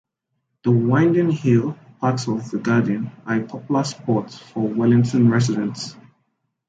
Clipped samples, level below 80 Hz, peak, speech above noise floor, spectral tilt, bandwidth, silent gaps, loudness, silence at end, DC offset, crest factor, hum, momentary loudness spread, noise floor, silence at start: under 0.1%; -60 dBFS; -4 dBFS; 56 dB; -7 dB/octave; 9 kHz; none; -20 LUFS; 0.7 s; under 0.1%; 16 dB; none; 10 LU; -75 dBFS; 0.65 s